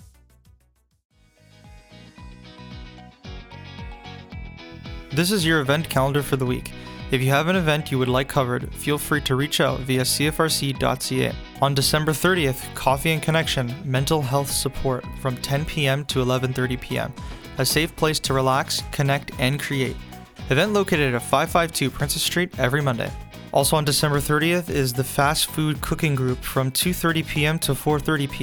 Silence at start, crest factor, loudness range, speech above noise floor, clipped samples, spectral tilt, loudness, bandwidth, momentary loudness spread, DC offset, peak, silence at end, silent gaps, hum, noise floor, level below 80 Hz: 0 s; 20 dB; 3 LU; 41 dB; under 0.1%; -4.5 dB/octave; -22 LUFS; over 20 kHz; 18 LU; under 0.1%; -4 dBFS; 0 s; 1.05-1.09 s; none; -63 dBFS; -40 dBFS